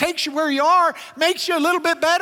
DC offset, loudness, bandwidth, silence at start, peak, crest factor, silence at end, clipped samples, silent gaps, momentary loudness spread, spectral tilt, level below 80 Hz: under 0.1%; -19 LUFS; 17 kHz; 0 s; -4 dBFS; 16 dB; 0 s; under 0.1%; none; 5 LU; -1.5 dB/octave; -64 dBFS